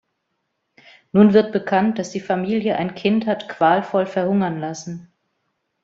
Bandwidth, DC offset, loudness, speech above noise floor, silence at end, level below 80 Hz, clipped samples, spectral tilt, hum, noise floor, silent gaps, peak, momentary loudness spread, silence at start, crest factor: 7.6 kHz; under 0.1%; -19 LUFS; 55 dB; 0.8 s; -62 dBFS; under 0.1%; -6.5 dB/octave; none; -74 dBFS; none; -2 dBFS; 14 LU; 1.15 s; 18 dB